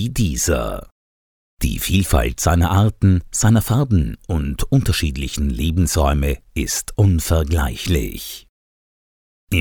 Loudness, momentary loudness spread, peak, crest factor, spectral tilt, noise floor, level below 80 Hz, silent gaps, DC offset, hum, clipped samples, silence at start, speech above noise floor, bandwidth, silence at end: -19 LUFS; 8 LU; 0 dBFS; 18 dB; -5 dB/octave; under -90 dBFS; -26 dBFS; 0.91-1.57 s, 8.49-9.47 s; under 0.1%; none; under 0.1%; 0 s; over 73 dB; 19.5 kHz; 0 s